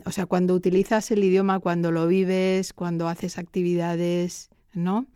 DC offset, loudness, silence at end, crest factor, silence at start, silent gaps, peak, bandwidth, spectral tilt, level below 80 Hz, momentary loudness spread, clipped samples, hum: under 0.1%; -24 LUFS; 0.1 s; 14 dB; 0.05 s; none; -10 dBFS; 14.5 kHz; -6.5 dB/octave; -58 dBFS; 9 LU; under 0.1%; none